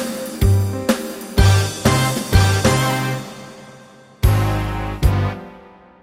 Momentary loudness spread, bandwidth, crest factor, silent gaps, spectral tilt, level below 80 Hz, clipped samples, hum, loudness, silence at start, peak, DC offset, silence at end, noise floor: 11 LU; 16 kHz; 16 dB; none; -5 dB/octave; -26 dBFS; under 0.1%; none; -18 LUFS; 0 s; -2 dBFS; under 0.1%; 0.45 s; -44 dBFS